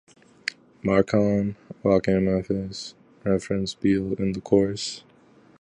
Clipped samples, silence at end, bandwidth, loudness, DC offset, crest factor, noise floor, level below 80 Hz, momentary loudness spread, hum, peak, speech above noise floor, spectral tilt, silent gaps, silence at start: under 0.1%; 0.6 s; 10 kHz; -25 LUFS; under 0.1%; 20 dB; -55 dBFS; -50 dBFS; 13 LU; none; -4 dBFS; 32 dB; -6.5 dB/octave; none; 0.45 s